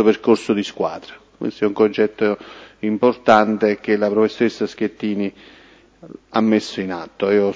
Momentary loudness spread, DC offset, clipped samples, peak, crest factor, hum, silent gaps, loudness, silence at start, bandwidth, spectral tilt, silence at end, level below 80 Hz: 13 LU; under 0.1%; under 0.1%; 0 dBFS; 18 dB; none; none; -19 LUFS; 0 s; 8 kHz; -6 dB/octave; 0 s; -58 dBFS